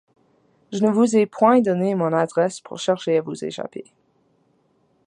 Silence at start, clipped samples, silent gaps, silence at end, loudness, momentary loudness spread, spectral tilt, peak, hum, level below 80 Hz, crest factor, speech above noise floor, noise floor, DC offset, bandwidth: 0.7 s; under 0.1%; none; 1.25 s; -20 LUFS; 15 LU; -6 dB/octave; -2 dBFS; none; -70 dBFS; 20 dB; 44 dB; -64 dBFS; under 0.1%; 10.5 kHz